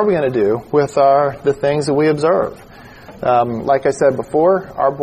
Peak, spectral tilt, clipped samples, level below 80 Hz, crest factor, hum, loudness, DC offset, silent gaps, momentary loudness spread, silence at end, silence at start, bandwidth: -2 dBFS; -6.5 dB/octave; under 0.1%; -48 dBFS; 14 dB; none; -16 LUFS; under 0.1%; none; 5 LU; 0 s; 0 s; 13 kHz